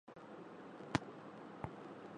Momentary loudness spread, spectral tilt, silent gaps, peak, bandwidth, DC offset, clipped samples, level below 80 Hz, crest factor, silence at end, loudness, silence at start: 12 LU; -5.5 dB/octave; none; -16 dBFS; 10 kHz; under 0.1%; under 0.1%; -68 dBFS; 32 dB; 0 s; -48 LUFS; 0.05 s